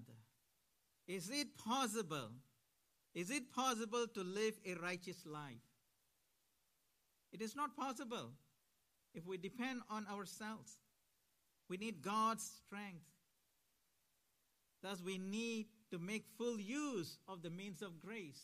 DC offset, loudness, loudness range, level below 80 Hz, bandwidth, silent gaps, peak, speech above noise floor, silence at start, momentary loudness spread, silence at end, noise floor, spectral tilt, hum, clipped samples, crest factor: under 0.1%; -45 LUFS; 7 LU; under -90 dBFS; 15 kHz; none; -28 dBFS; 38 dB; 0 s; 15 LU; 0 s; -83 dBFS; -3.5 dB/octave; none; under 0.1%; 20 dB